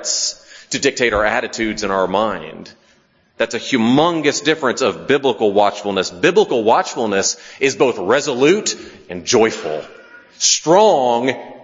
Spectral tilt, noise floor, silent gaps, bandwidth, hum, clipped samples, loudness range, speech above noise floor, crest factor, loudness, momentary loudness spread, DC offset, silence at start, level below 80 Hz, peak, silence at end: -3 dB/octave; -56 dBFS; none; 7.8 kHz; none; under 0.1%; 3 LU; 39 dB; 16 dB; -16 LUFS; 10 LU; under 0.1%; 0 s; -48 dBFS; 0 dBFS; 0 s